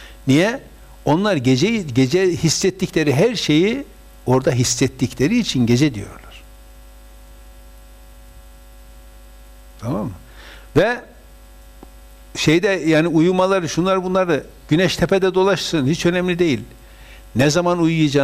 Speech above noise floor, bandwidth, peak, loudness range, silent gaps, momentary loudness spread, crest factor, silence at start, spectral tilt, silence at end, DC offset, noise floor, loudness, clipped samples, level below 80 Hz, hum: 26 dB; 15.5 kHz; -6 dBFS; 8 LU; none; 10 LU; 14 dB; 0 s; -5 dB/octave; 0 s; under 0.1%; -42 dBFS; -18 LUFS; under 0.1%; -42 dBFS; none